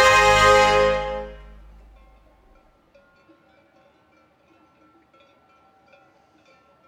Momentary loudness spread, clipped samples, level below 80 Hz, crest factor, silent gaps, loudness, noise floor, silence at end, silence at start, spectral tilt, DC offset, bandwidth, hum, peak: 19 LU; under 0.1%; -42 dBFS; 20 dB; none; -16 LUFS; -59 dBFS; 5.5 s; 0 s; -2.5 dB/octave; under 0.1%; 16.5 kHz; none; -4 dBFS